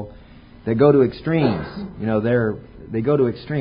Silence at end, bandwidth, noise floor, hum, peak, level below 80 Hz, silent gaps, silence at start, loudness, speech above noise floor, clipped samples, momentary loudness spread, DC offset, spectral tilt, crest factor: 0 s; 5.2 kHz; -44 dBFS; none; -2 dBFS; -46 dBFS; none; 0 s; -20 LUFS; 25 dB; under 0.1%; 17 LU; under 0.1%; -12.5 dB/octave; 18 dB